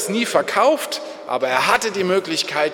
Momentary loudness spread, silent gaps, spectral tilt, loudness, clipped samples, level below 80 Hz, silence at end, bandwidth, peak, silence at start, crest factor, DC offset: 9 LU; none; -3 dB/octave; -19 LUFS; under 0.1%; -62 dBFS; 0 s; 19 kHz; -2 dBFS; 0 s; 18 dB; under 0.1%